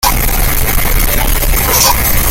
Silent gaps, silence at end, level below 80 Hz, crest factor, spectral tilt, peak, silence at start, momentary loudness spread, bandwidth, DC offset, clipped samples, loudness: none; 0 s; -14 dBFS; 10 dB; -2.5 dB/octave; 0 dBFS; 0 s; 4 LU; 17.5 kHz; under 0.1%; under 0.1%; -11 LUFS